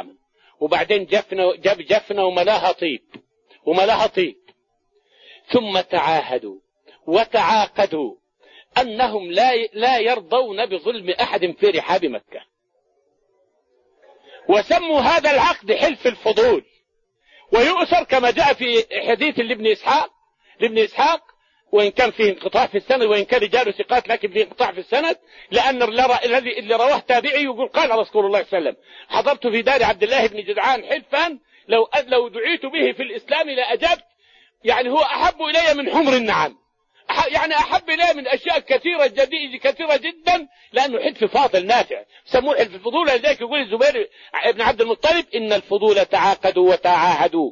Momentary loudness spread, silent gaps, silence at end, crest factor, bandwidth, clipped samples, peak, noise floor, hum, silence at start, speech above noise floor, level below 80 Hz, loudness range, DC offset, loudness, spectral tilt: 7 LU; none; 0 s; 16 dB; 7.4 kHz; under 0.1%; -4 dBFS; -67 dBFS; none; 0.05 s; 49 dB; -52 dBFS; 3 LU; under 0.1%; -18 LUFS; -3.5 dB/octave